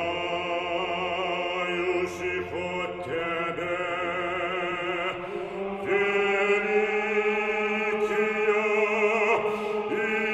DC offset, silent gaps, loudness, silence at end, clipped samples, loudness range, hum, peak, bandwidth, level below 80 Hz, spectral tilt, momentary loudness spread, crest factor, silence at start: under 0.1%; none; -26 LUFS; 0 s; under 0.1%; 5 LU; none; -10 dBFS; 9.8 kHz; -62 dBFS; -4.5 dB/octave; 7 LU; 16 dB; 0 s